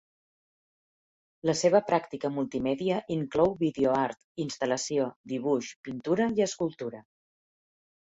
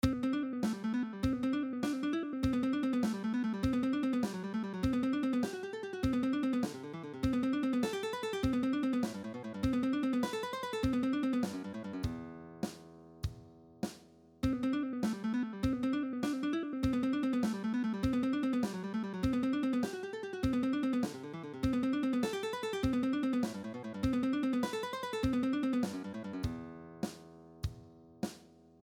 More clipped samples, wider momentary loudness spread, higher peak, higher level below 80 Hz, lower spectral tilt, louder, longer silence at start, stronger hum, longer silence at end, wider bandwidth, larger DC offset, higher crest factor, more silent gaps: neither; about the same, 11 LU vs 10 LU; first, -10 dBFS vs -16 dBFS; second, -64 dBFS vs -52 dBFS; second, -5 dB/octave vs -6.5 dB/octave; first, -29 LUFS vs -35 LUFS; first, 1.45 s vs 0.05 s; neither; first, 1 s vs 0.35 s; second, 8.4 kHz vs 15 kHz; neither; about the same, 20 dB vs 18 dB; first, 4.24-4.35 s, 5.16-5.24 s, 5.76-5.84 s vs none